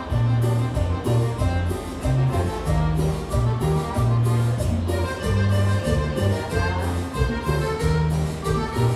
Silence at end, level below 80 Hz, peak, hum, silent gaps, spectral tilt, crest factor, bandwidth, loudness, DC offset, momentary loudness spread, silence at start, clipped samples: 0 s; -30 dBFS; -8 dBFS; none; none; -7 dB/octave; 14 dB; 14 kHz; -23 LUFS; under 0.1%; 4 LU; 0 s; under 0.1%